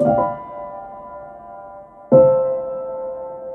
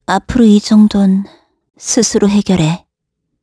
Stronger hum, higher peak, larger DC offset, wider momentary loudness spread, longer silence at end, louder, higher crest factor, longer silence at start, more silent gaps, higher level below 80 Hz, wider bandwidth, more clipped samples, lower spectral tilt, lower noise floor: neither; about the same, -2 dBFS vs 0 dBFS; neither; first, 24 LU vs 12 LU; second, 0 s vs 0.65 s; second, -18 LUFS vs -11 LUFS; first, 18 dB vs 12 dB; about the same, 0 s vs 0.1 s; neither; second, -52 dBFS vs -38 dBFS; second, 2.8 kHz vs 11 kHz; neither; first, -11.5 dB/octave vs -5.5 dB/octave; second, -39 dBFS vs -72 dBFS